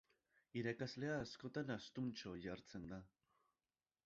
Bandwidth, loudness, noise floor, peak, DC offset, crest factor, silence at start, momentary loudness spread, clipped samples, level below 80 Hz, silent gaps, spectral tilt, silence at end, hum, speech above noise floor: 7.6 kHz; -48 LUFS; under -90 dBFS; -30 dBFS; under 0.1%; 20 dB; 0.55 s; 8 LU; under 0.1%; -74 dBFS; none; -5 dB/octave; 1 s; none; over 42 dB